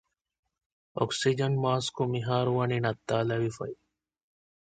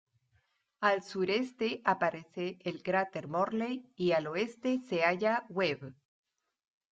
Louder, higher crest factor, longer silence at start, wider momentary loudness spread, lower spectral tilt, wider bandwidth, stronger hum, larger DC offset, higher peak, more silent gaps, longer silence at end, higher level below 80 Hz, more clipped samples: first, -29 LUFS vs -33 LUFS; about the same, 20 dB vs 20 dB; first, 0.95 s vs 0.8 s; first, 12 LU vs 8 LU; about the same, -5.5 dB/octave vs -6 dB/octave; first, 9.2 kHz vs 8 kHz; neither; neither; about the same, -10 dBFS vs -12 dBFS; neither; about the same, 0.95 s vs 1 s; first, -64 dBFS vs -76 dBFS; neither